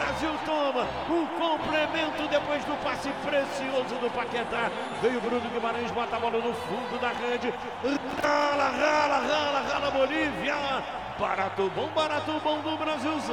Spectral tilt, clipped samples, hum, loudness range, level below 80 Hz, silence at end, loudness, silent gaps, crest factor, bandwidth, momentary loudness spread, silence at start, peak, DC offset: -4 dB/octave; under 0.1%; none; 3 LU; -56 dBFS; 0 s; -28 LUFS; none; 16 dB; 17 kHz; 6 LU; 0 s; -12 dBFS; 0.1%